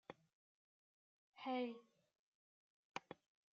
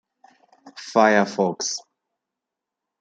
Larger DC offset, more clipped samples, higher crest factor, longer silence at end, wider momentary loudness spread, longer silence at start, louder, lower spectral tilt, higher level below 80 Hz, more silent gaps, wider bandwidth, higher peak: neither; neither; about the same, 24 dB vs 22 dB; second, 0.4 s vs 1.2 s; first, 18 LU vs 14 LU; second, 0.1 s vs 0.65 s; second, -49 LUFS vs -21 LUFS; about the same, -2.5 dB/octave vs -3.5 dB/octave; second, under -90 dBFS vs -72 dBFS; first, 0.33-1.33 s, 2.19-2.94 s vs none; second, 7.2 kHz vs 9.4 kHz; second, -28 dBFS vs -2 dBFS